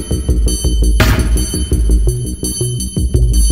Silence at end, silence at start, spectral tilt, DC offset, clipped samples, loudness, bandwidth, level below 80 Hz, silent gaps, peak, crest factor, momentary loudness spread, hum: 0 s; 0 s; -4.5 dB/octave; 1%; under 0.1%; -15 LUFS; 16 kHz; -14 dBFS; none; 0 dBFS; 12 dB; 5 LU; none